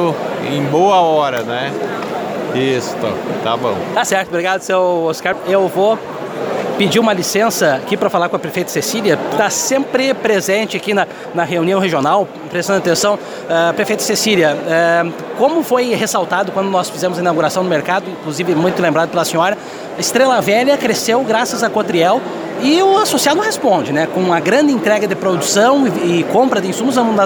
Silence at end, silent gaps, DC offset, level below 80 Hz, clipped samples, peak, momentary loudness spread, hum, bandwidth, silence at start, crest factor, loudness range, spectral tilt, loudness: 0 s; none; under 0.1%; -60 dBFS; under 0.1%; 0 dBFS; 8 LU; none; over 20 kHz; 0 s; 14 dB; 3 LU; -4 dB/octave; -15 LUFS